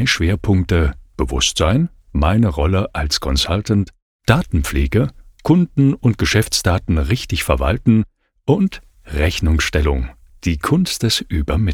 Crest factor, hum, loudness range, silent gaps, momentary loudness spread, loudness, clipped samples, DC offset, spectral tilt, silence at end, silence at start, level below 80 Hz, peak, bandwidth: 16 dB; none; 2 LU; 4.02-4.19 s; 8 LU; -18 LUFS; under 0.1%; under 0.1%; -5 dB/octave; 0 s; 0 s; -26 dBFS; 0 dBFS; 17.5 kHz